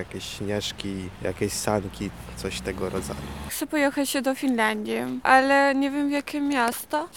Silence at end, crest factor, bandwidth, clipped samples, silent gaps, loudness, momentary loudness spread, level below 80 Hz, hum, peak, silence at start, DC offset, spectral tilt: 0 s; 22 dB; 18.5 kHz; under 0.1%; none; -25 LUFS; 14 LU; -48 dBFS; none; -4 dBFS; 0 s; 0.1%; -4 dB/octave